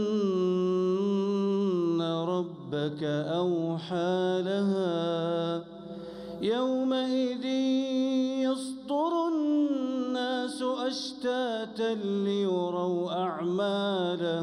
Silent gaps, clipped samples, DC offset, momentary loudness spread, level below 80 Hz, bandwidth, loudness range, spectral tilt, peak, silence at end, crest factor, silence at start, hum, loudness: none; under 0.1%; under 0.1%; 5 LU; -72 dBFS; 11.5 kHz; 2 LU; -6.5 dB/octave; -18 dBFS; 0 s; 10 dB; 0 s; none; -29 LUFS